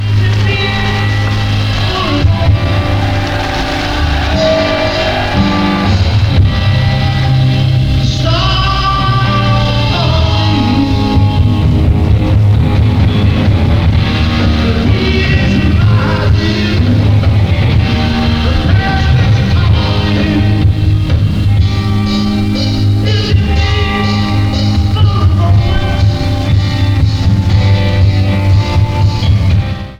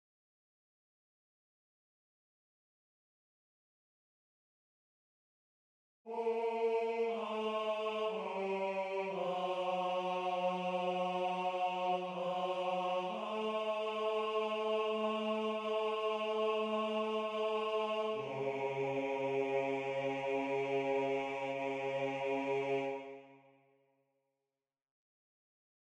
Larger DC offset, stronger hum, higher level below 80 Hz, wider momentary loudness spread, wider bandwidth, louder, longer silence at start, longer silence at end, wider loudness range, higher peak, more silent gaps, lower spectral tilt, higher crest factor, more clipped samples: neither; neither; first, -18 dBFS vs -84 dBFS; about the same, 3 LU vs 3 LU; second, 7.8 kHz vs 10 kHz; first, -11 LUFS vs -37 LUFS; second, 0 s vs 6.05 s; second, 0.05 s vs 2.5 s; second, 2 LU vs 5 LU; first, 0 dBFS vs -24 dBFS; neither; first, -7 dB/octave vs -5.5 dB/octave; about the same, 10 dB vs 14 dB; neither